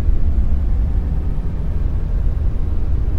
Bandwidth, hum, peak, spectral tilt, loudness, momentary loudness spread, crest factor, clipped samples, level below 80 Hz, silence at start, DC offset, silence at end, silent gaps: 3.3 kHz; none; -2 dBFS; -10 dB/octave; -22 LUFS; 3 LU; 12 dB; under 0.1%; -18 dBFS; 0 s; under 0.1%; 0 s; none